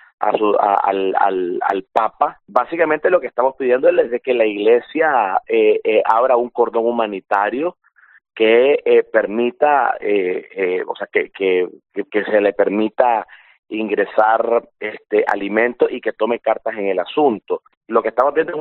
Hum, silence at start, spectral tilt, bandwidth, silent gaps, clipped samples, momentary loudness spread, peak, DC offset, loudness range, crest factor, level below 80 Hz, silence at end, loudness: none; 0.2 s; -2.5 dB/octave; 4.2 kHz; 13.59-13.63 s, 17.77-17.81 s; under 0.1%; 7 LU; 0 dBFS; under 0.1%; 3 LU; 16 dB; -66 dBFS; 0 s; -17 LUFS